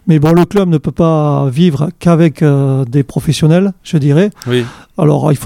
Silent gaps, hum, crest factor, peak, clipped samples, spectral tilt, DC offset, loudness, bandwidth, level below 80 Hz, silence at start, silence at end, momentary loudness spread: none; none; 10 dB; 0 dBFS; under 0.1%; -7.5 dB/octave; under 0.1%; -11 LUFS; 14.5 kHz; -40 dBFS; 0.05 s; 0 s; 5 LU